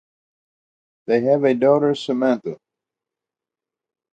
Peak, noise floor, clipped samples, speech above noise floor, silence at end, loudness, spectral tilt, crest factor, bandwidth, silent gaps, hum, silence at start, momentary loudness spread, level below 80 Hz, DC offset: -4 dBFS; -88 dBFS; under 0.1%; 70 dB; 1.6 s; -19 LUFS; -7 dB/octave; 18 dB; 8.8 kHz; none; none; 1.1 s; 11 LU; -72 dBFS; under 0.1%